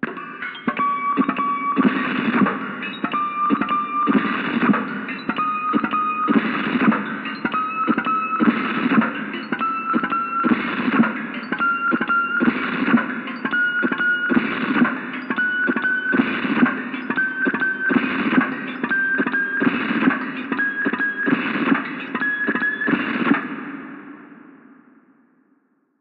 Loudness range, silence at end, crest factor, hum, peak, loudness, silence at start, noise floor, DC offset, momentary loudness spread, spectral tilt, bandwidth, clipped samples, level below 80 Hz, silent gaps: 2 LU; 1.45 s; 18 dB; none; -2 dBFS; -21 LUFS; 0 s; -63 dBFS; under 0.1%; 8 LU; -8.5 dB/octave; 5 kHz; under 0.1%; -64 dBFS; none